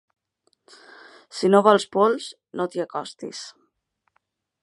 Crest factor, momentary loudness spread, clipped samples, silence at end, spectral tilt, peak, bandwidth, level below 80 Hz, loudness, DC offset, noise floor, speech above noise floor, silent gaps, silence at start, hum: 24 dB; 20 LU; under 0.1%; 1.15 s; -5 dB/octave; -2 dBFS; 11.5 kHz; -78 dBFS; -21 LUFS; under 0.1%; -74 dBFS; 52 dB; none; 1.35 s; none